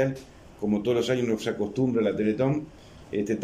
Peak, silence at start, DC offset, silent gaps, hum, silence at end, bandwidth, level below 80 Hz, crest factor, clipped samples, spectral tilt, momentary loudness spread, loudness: -10 dBFS; 0 s; under 0.1%; none; none; 0 s; 14.5 kHz; -56 dBFS; 16 dB; under 0.1%; -6.5 dB/octave; 9 LU; -27 LUFS